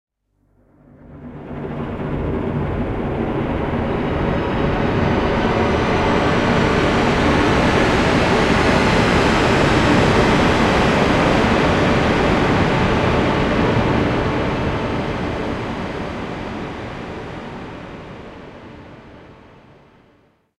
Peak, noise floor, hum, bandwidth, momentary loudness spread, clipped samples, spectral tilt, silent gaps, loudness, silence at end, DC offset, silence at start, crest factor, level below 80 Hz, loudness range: -2 dBFS; -62 dBFS; none; 13 kHz; 16 LU; under 0.1%; -6 dB/octave; none; -17 LUFS; 1.25 s; under 0.1%; 1.1 s; 16 dB; -30 dBFS; 14 LU